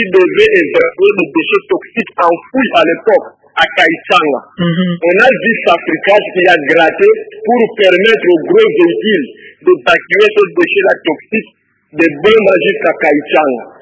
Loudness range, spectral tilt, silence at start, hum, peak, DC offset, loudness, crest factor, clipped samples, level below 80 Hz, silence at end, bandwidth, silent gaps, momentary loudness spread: 2 LU; -6 dB/octave; 0 s; none; 0 dBFS; under 0.1%; -10 LUFS; 10 dB; 0.7%; -52 dBFS; 0.15 s; 8 kHz; none; 7 LU